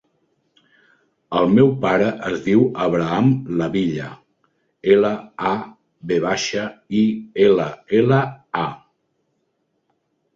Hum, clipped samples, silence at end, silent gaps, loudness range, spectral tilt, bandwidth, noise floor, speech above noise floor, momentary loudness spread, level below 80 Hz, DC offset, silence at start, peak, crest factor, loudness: none; under 0.1%; 1.6 s; none; 3 LU; -6.5 dB/octave; 7.6 kHz; -70 dBFS; 52 dB; 10 LU; -56 dBFS; under 0.1%; 1.3 s; -2 dBFS; 18 dB; -19 LUFS